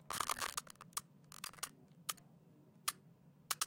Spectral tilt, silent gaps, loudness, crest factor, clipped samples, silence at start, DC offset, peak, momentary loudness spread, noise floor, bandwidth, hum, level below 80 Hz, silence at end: 0 dB/octave; none; -44 LUFS; 28 dB; under 0.1%; 0 s; under 0.1%; -20 dBFS; 12 LU; -65 dBFS; 17 kHz; none; -76 dBFS; 0 s